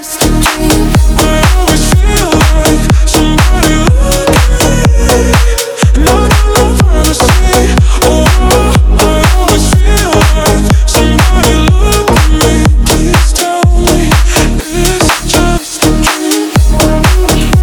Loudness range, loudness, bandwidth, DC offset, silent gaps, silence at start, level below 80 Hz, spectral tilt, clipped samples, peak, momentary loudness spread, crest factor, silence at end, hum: 1 LU; -8 LUFS; over 20 kHz; under 0.1%; none; 0 s; -10 dBFS; -4.5 dB/octave; 0.3%; 0 dBFS; 2 LU; 6 dB; 0 s; none